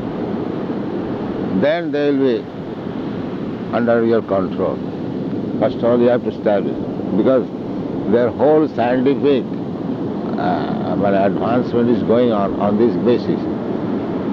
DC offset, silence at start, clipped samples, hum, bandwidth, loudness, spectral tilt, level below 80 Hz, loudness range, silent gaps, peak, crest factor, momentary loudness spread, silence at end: under 0.1%; 0 s; under 0.1%; none; 6.4 kHz; -18 LUFS; -9 dB/octave; -50 dBFS; 4 LU; none; -4 dBFS; 14 dB; 9 LU; 0 s